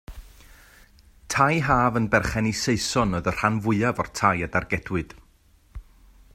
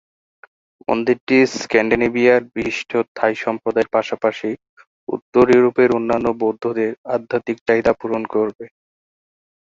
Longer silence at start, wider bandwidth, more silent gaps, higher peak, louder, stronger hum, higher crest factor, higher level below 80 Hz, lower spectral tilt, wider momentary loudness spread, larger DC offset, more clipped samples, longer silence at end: second, 0.1 s vs 0.9 s; first, 16 kHz vs 7.6 kHz; second, none vs 1.21-1.27 s, 3.08-3.15 s, 4.69-4.77 s, 4.87-5.07 s, 5.22-5.33 s, 6.98-7.04 s, 7.61-7.66 s, 8.55-8.59 s; about the same, -4 dBFS vs -2 dBFS; second, -23 LUFS vs -18 LUFS; neither; about the same, 22 dB vs 18 dB; first, -44 dBFS vs -52 dBFS; about the same, -5 dB/octave vs -5.5 dB/octave; second, 7 LU vs 10 LU; neither; neither; second, 0.5 s vs 1.05 s